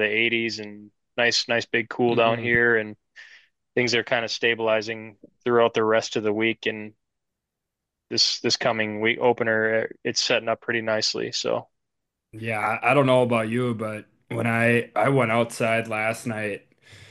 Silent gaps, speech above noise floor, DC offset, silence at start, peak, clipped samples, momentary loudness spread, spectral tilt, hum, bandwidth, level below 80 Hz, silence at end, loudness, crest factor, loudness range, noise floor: none; 60 dB; under 0.1%; 0 s; -6 dBFS; under 0.1%; 11 LU; -4 dB/octave; none; 12.5 kHz; -64 dBFS; 0.15 s; -23 LUFS; 18 dB; 3 LU; -84 dBFS